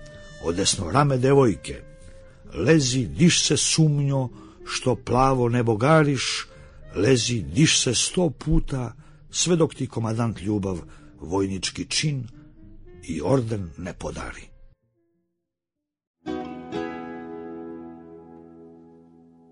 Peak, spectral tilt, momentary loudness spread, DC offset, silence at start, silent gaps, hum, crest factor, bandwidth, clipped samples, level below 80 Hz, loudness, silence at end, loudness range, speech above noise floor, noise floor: -4 dBFS; -4.5 dB/octave; 19 LU; under 0.1%; 0 s; 16.07-16.14 s; none; 20 dB; 10.5 kHz; under 0.1%; -40 dBFS; -23 LUFS; 0.8 s; 16 LU; 64 dB; -86 dBFS